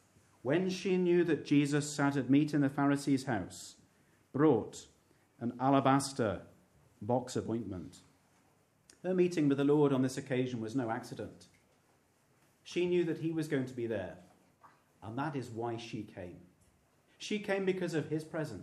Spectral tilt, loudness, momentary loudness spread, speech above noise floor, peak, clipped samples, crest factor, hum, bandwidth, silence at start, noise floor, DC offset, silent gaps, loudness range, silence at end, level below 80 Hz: -6 dB/octave; -33 LUFS; 17 LU; 38 dB; -14 dBFS; under 0.1%; 20 dB; none; 13 kHz; 0.45 s; -70 dBFS; under 0.1%; none; 8 LU; 0 s; -74 dBFS